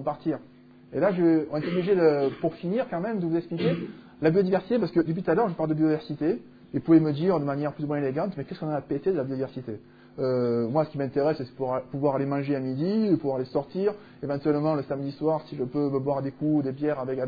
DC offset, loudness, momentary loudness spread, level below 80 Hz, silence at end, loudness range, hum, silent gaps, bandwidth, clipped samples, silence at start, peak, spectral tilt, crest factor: under 0.1%; -27 LUFS; 10 LU; -64 dBFS; 0 s; 3 LU; none; none; 5 kHz; under 0.1%; 0 s; -8 dBFS; -10.5 dB/octave; 18 dB